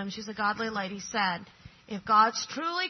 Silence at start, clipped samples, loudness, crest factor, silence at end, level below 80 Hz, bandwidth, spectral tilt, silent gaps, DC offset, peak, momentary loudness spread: 0 s; under 0.1%; -28 LUFS; 20 dB; 0 s; -66 dBFS; 6.4 kHz; -3 dB/octave; none; under 0.1%; -8 dBFS; 15 LU